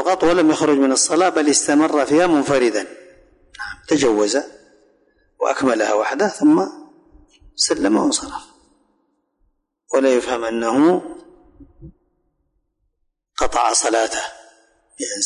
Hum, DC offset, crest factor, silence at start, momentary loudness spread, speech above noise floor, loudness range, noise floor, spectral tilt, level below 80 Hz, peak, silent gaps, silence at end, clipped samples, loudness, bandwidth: none; under 0.1%; 14 dB; 0 s; 16 LU; 54 dB; 6 LU; -71 dBFS; -3 dB/octave; -50 dBFS; -6 dBFS; none; 0 s; under 0.1%; -17 LUFS; 11 kHz